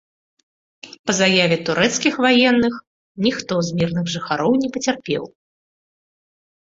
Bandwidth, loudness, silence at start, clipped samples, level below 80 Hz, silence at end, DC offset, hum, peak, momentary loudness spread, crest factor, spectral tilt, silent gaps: 7.8 kHz; -18 LUFS; 0.85 s; under 0.1%; -56 dBFS; 1.4 s; under 0.1%; none; 0 dBFS; 10 LU; 20 dB; -4 dB/octave; 0.99-1.04 s, 2.87-3.15 s